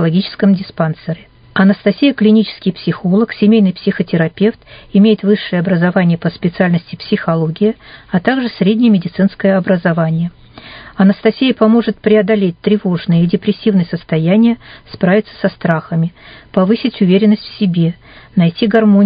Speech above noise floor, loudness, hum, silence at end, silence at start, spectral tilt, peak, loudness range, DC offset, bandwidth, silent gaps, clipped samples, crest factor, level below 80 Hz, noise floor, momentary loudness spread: 22 dB; -13 LUFS; none; 0 s; 0 s; -11 dB/octave; 0 dBFS; 2 LU; under 0.1%; 5.2 kHz; none; under 0.1%; 12 dB; -50 dBFS; -35 dBFS; 8 LU